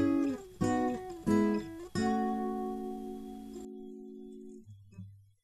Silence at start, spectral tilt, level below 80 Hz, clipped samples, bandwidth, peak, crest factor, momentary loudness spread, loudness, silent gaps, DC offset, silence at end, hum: 0 s; -6.5 dB/octave; -60 dBFS; under 0.1%; 14 kHz; -16 dBFS; 18 dB; 21 LU; -34 LUFS; none; under 0.1%; 0.2 s; none